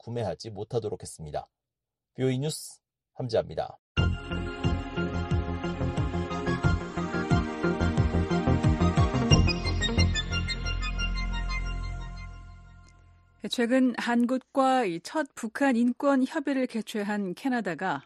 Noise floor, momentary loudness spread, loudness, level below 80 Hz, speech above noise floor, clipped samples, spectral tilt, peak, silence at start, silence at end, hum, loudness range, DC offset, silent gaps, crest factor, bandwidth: -89 dBFS; 12 LU; -28 LUFS; -38 dBFS; 61 dB; under 0.1%; -6 dB/octave; -4 dBFS; 0.05 s; 0.05 s; none; 8 LU; under 0.1%; 3.79-3.95 s; 24 dB; 12 kHz